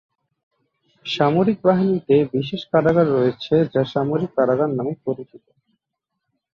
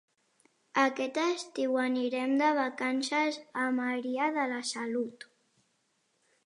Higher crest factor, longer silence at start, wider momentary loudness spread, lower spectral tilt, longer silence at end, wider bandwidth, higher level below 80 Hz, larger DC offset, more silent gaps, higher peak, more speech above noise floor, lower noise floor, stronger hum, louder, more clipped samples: about the same, 16 dB vs 18 dB; first, 1.05 s vs 0.75 s; first, 10 LU vs 6 LU; first, -8 dB/octave vs -2.5 dB/octave; about the same, 1.2 s vs 1.3 s; second, 7.2 kHz vs 11 kHz; first, -58 dBFS vs -88 dBFS; neither; neither; first, -4 dBFS vs -14 dBFS; first, 61 dB vs 45 dB; first, -80 dBFS vs -75 dBFS; neither; first, -19 LUFS vs -31 LUFS; neither